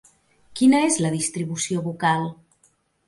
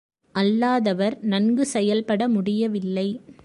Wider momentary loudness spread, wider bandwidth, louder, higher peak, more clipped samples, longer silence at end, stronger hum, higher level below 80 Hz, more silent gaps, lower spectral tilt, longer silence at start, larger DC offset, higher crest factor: first, 9 LU vs 5 LU; about the same, 11.5 kHz vs 11.5 kHz; about the same, -22 LUFS vs -22 LUFS; about the same, -6 dBFS vs -8 dBFS; neither; first, 0.75 s vs 0.1 s; neither; about the same, -64 dBFS vs -68 dBFS; neither; second, -4.5 dB/octave vs -6 dB/octave; first, 0.5 s vs 0.35 s; neither; about the same, 16 dB vs 14 dB